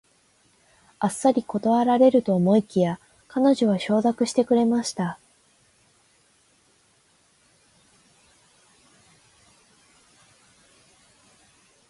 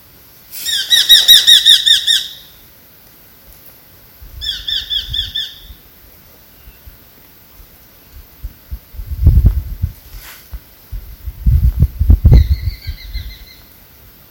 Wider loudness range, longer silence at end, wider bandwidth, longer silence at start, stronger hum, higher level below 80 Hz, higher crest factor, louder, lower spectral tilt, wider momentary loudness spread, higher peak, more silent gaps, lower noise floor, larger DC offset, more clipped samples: second, 8 LU vs 14 LU; first, 6.75 s vs 0.85 s; second, 11.5 kHz vs over 20 kHz; first, 1 s vs 0.5 s; neither; second, -68 dBFS vs -20 dBFS; about the same, 20 dB vs 16 dB; second, -22 LUFS vs -10 LUFS; first, -6 dB/octave vs -2.5 dB/octave; second, 12 LU vs 28 LU; second, -6 dBFS vs 0 dBFS; neither; first, -62 dBFS vs -43 dBFS; neither; second, under 0.1% vs 0.9%